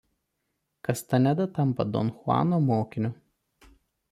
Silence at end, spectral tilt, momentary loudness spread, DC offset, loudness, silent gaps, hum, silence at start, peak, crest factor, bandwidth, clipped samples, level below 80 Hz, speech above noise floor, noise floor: 1 s; -7.5 dB/octave; 8 LU; under 0.1%; -27 LUFS; none; none; 0.9 s; -10 dBFS; 18 dB; 15.5 kHz; under 0.1%; -62 dBFS; 54 dB; -79 dBFS